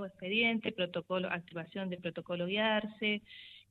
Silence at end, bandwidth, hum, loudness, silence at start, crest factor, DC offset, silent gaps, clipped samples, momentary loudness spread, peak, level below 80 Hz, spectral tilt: 0.1 s; 4.8 kHz; none; -34 LUFS; 0 s; 18 dB; under 0.1%; none; under 0.1%; 11 LU; -18 dBFS; -74 dBFS; -7.5 dB/octave